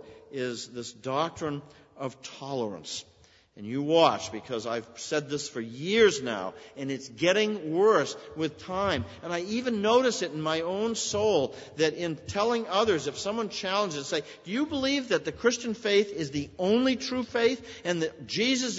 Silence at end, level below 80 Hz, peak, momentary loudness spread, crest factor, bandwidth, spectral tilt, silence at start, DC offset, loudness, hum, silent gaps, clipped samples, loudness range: 0 s; -62 dBFS; -6 dBFS; 12 LU; 22 dB; 8 kHz; -4 dB/octave; 0.05 s; under 0.1%; -28 LUFS; none; none; under 0.1%; 3 LU